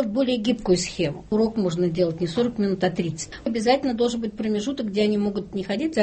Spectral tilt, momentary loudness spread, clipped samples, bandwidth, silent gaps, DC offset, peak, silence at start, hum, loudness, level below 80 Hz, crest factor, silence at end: -5.5 dB/octave; 6 LU; under 0.1%; 8.8 kHz; none; under 0.1%; -8 dBFS; 0 s; none; -24 LUFS; -50 dBFS; 16 dB; 0 s